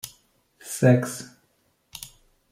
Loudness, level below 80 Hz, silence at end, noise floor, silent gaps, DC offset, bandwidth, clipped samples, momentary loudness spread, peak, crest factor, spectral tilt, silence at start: -22 LUFS; -64 dBFS; 0.45 s; -68 dBFS; none; under 0.1%; 16.5 kHz; under 0.1%; 25 LU; -6 dBFS; 22 dB; -6 dB/octave; 0.05 s